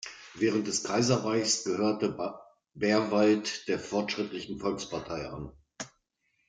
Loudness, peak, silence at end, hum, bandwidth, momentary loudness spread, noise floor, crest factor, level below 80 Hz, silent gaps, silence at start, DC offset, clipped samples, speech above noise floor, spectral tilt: -29 LUFS; -12 dBFS; 0.6 s; none; 9.6 kHz; 17 LU; -76 dBFS; 20 dB; -62 dBFS; none; 0 s; under 0.1%; under 0.1%; 47 dB; -4 dB/octave